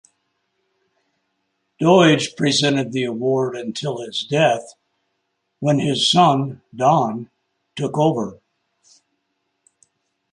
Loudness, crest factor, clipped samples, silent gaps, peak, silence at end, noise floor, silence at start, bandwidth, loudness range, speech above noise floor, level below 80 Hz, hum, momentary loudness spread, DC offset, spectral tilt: -18 LUFS; 18 dB; under 0.1%; none; -2 dBFS; 2 s; -73 dBFS; 1.8 s; 11 kHz; 5 LU; 55 dB; -64 dBFS; none; 12 LU; under 0.1%; -5 dB/octave